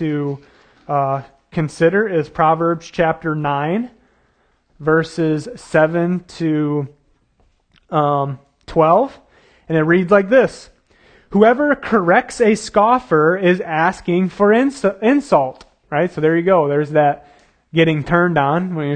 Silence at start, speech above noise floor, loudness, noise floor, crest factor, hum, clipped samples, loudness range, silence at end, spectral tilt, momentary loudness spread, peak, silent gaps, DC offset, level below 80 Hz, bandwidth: 0 s; 44 dB; -16 LUFS; -60 dBFS; 16 dB; none; under 0.1%; 5 LU; 0 s; -7 dB/octave; 10 LU; 0 dBFS; none; under 0.1%; -50 dBFS; 9.6 kHz